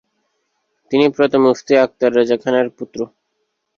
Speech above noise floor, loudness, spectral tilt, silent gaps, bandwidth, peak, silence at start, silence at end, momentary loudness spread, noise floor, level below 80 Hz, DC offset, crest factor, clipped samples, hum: 56 dB; -16 LUFS; -5.5 dB/octave; none; 7.4 kHz; -2 dBFS; 0.9 s; 0.7 s; 13 LU; -71 dBFS; -60 dBFS; under 0.1%; 16 dB; under 0.1%; none